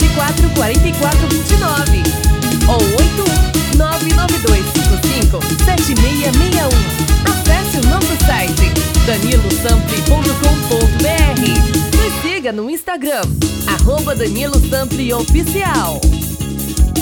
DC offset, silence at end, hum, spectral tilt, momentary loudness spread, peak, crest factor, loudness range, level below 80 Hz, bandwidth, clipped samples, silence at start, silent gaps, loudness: under 0.1%; 0 s; none; -4.5 dB/octave; 4 LU; 0 dBFS; 12 dB; 2 LU; -16 dBFS; over 20 kHz; under 0.1%; 0 s; none; -14 LUFS